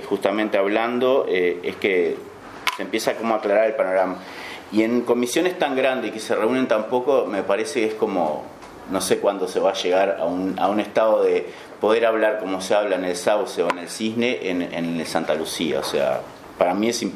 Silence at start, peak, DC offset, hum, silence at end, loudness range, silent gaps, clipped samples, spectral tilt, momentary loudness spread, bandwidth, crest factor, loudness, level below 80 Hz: 0 s; 0 dBFS; under 0.1%; none; 0 s; 2 LU; none; under 0.1%; -4 dB/octave; 7 LU; 15.5 kHz; 22 dB; -22 LUFS; -64 dBFS